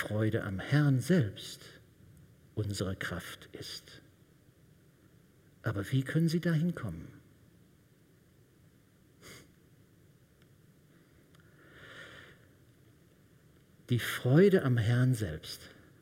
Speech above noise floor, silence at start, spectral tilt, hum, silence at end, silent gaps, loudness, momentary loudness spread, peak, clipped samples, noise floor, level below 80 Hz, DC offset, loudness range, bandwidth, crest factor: 33 dB; 0 s; -6.5 dB/octave; none; 0.35 s; none; -31 LUFS; 25 LU; -14 dBFS; under 0.1%; -63 dBFS; -64 dBFS; under 0.1%; 25 LU; 16 kHz; 22 dB